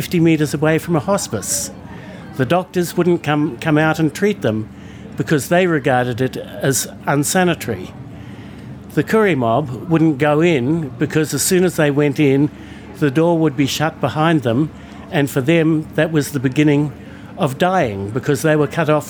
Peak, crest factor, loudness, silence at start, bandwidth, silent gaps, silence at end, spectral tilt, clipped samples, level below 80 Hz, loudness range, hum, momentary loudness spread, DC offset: -2 dBFS; 16 dB; -17 LUFS; 0 s; over 20 kHz; none; 0 s; -5.5 dB/octave; under 0.1%; -50 dBFS; 3 LU; none; 16 LU; under 0.1%